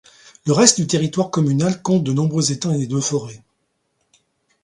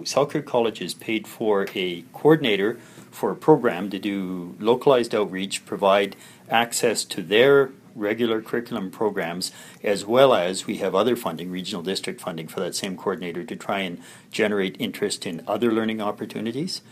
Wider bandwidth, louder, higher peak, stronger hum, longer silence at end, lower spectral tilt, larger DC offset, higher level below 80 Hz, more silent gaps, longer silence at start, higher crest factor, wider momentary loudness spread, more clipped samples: second, 11.5 kHz vs 15.5 kHz; first, -18 LUFS vs -23 LUFS; about the same, 0 dBFS vs -2 dBFS; neither; first, 1.25 s vs 0.1 s; about the same, -4.5 dB/octave vs -4.5 dB/octave; neither; first, -58 dBFS vs -70 dBFS; neither; first, 0.45 s vs 0 s; about the same, 20 dB vs 20 dB; second, 9 LU vs 12 LU; neither